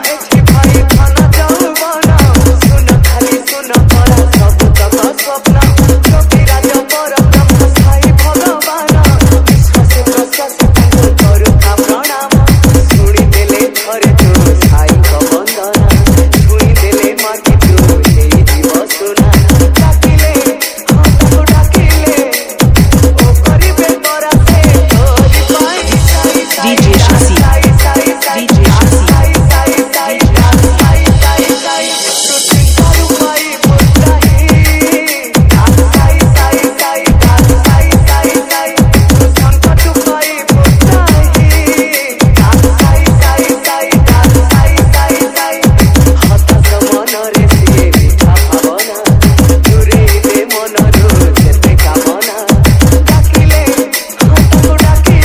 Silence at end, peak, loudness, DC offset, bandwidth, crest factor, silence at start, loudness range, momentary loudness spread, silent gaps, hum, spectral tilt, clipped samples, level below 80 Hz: 0 s; 0 dBFS; -7 LUFS; under 0.1%; 16.5 kHz; 6 dB; 0 s; 1 LU; 4 LU; none; none; -5 dB/octave; 6%; -12 dBFS